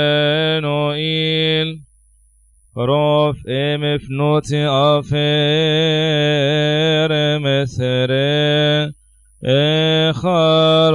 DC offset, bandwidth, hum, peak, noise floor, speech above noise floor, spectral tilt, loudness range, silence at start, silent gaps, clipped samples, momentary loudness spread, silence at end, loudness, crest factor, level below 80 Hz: under 0.1%; 10.5 kHz; none; -4 dBFS; -53 dBFS; 38 dB; -6 dB/octave; 3 LU; 0 s; none; under 0.1%; 5 LU; 0 s; -16 LUFS; 12 dB; -48 dBFS